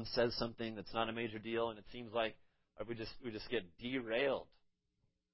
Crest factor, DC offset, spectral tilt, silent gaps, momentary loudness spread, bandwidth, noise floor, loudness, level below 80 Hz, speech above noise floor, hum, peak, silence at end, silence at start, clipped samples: 20 dB; under 0.1%; -8 dB/octave; none; 10 LU; 5.8 kHz; -82 dBFS; -41 LUFS; -64 dBFS; 42 dB; none; -22 dBFS; 0.9 s; 0 s; under 0.1%